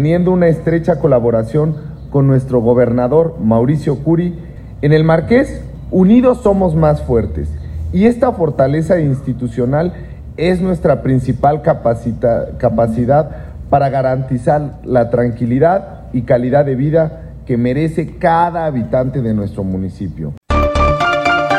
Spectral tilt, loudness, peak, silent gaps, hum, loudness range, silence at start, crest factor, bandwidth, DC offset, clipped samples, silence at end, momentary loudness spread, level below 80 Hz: -8.5 dB/octave; -14 LUFS; 0 dBFS; 20.37-20.41 s; none; 3 LU; 0 s; 12 dB; 11 kHz; under 0.1%; under 0.1%; 0 s; 9 LU; -30 dBFS